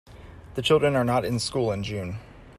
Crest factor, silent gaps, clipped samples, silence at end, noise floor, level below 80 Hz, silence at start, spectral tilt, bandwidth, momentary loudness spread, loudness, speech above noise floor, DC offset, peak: 18 dB; none; under 0.1%; 0.05 s; -45 dBFS; -50 dBFS; 0.1 s; -5.5 dB/octave; 14 kHz; 15 LU; -25 LUFS; 20 dB; under 0.1%; -8 dBFS